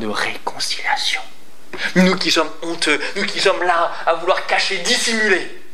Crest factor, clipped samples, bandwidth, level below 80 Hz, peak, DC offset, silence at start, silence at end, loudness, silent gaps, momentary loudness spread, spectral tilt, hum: 18 dB; under 0.1%; 14.5 kHz; -68 dBFS; 0 dBFS; 5%; 0 s; 0.15 s; -18 LUFS; none; 8 LU; -3 dB/octave; none